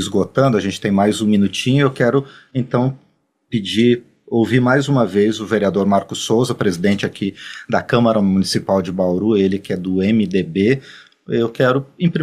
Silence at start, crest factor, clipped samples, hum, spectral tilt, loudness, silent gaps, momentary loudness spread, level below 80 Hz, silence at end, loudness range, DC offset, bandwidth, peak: 0 s; 16 dB; under 0.1%; none; -6 dB/octave; -17 LUFS; none; 7 LU; -54 dBFS; 0 s; 1 LU; under 0.1%; 13.5 kHz; -2 dBFS